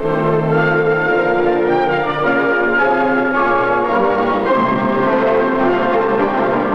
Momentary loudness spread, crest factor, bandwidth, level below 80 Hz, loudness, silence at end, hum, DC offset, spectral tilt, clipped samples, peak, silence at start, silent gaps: 2 LU; 12 dB; 6.8 kHz; -44 dBFS; -15 LUFS; 0 s; none; under 0.1%; -8 dB/octave; under 0.1%; -2 dBFS; 0 s; none